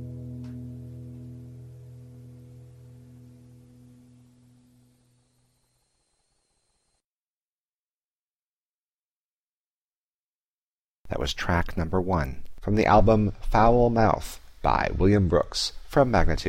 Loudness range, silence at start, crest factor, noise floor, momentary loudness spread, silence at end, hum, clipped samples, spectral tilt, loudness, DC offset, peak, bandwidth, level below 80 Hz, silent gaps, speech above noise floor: 23 LU; 0 s; 20 dB; under -90 dBFS; 23 LU; 0 s; none; under 0.1%; -6.5 dB/octave; -24 LUFS; under 0.1%; -8 dBFS; 16 kHz; -36 dBFS; 7.04-11.04 s; over 68 dB